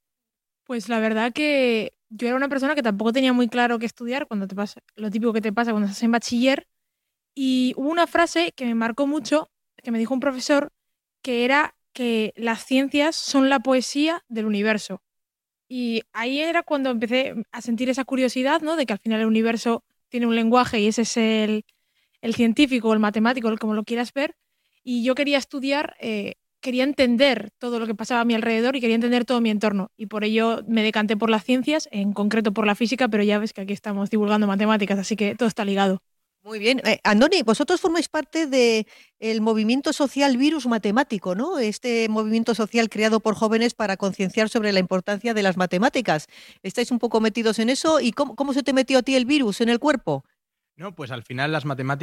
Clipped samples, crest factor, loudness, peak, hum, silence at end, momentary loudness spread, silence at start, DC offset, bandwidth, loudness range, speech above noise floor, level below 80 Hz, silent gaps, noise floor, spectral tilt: under 0.1%; 18 dB; -22 LUFS; -4 dBFS; none; 0 s; 9 LU; 0.7 s; under 0.1%; 13.5 kHz; 3 LU; 64 dB; -62 dBFS; none; -86 dBFS; -4.5 dB/octave